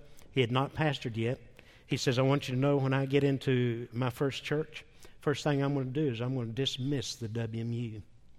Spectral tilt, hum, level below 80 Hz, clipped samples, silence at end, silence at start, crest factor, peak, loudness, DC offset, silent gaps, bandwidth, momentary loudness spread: -6 dB/octave; none; -60 dBFS; under 0.1%; 0 s; 0 s; 18 dB; -12 dBFS; -32 LUFS; under 0.1%; none; 14 kHz; 8 LU